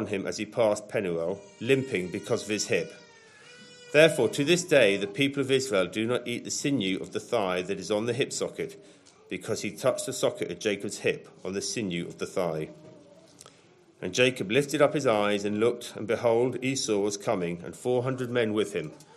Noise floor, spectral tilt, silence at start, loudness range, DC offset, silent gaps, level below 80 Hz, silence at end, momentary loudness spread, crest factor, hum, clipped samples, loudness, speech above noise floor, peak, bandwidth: -58 dBFS; -4 dB/octave; 0 s; 6 LU; under 0.1%; none; -72 dBFS; 0.15 s; 11 LU; 24 dB; none; under 0.1%; -27 LUFS; 31 dB; -4 dBFS; 13.5 kHz